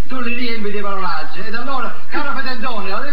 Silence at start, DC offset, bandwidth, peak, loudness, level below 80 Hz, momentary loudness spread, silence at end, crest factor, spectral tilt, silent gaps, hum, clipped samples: 0 s; 50%; over 20 kHz; -2 dBFS; -23 LUFS; -54 dBFS; 3 LU; 0 s; 16 dB; -6 dB/octave; none; 50 Hz at -50 dBFS; under 0.1%